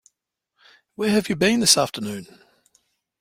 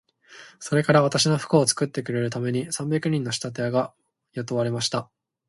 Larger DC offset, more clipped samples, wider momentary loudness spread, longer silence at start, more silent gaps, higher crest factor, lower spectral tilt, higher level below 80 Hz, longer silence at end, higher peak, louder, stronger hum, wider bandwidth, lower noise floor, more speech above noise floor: neither; neither; first, 16 LU vs 11 LU; first, 1 s vs 0.3 s; neither; about the same, 22 dB vs 20 dB; second, -3 dB/octave vs -4.5 dB/octave; first, -58 dBFS vs -64 dBFS; first, 0.95 s vs 0.45 s; about the same, -2 dBFS vs -4 dBFS; first, -20 LUFS vs -24 LUFS; neither; first, 16.5 kHz vs 11.5 kHz; first, -78 dBFS vs -49 dBFS; first, 58 dB vs 25 dB